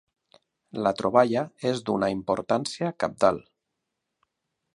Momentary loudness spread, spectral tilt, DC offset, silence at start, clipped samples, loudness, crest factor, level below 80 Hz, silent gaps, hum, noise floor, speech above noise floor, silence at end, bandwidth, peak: 7 LU; -5.5 dB/octave; under 0.1%; 0.75 s; under 0.1%; -25 LUFS; 22 dB; -62 dBFS; none; none; -82 dBFS; 57 dB; 1.35 s; 11.5 kHz; -6 dBFS